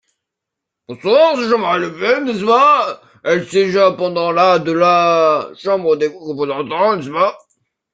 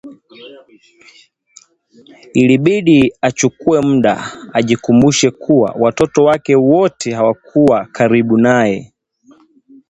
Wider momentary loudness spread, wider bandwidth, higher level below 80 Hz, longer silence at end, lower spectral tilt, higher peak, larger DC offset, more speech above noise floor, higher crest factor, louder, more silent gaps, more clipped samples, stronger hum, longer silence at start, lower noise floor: first, 9 LU vs 6 LU; about the same, 9.2 kHz vs 8.8 kHz; second, -62 dBFS vs -48 dBFS; second, 0.55 s vs 1.05 s; about the same, -5.5 dB/octave vs -5.5 dB/octave; about the same, -2 dBFS vs 0 dBFS; neither; first, 67 dB vs 36 dB; about the same, 14 dB vs 14 dB; about the same, -15 LUFS vs -13 LUFS; neither; neither; neither; first, 0.9 s vs 0.05 s; first, -81 dBFS vs -49 dBFS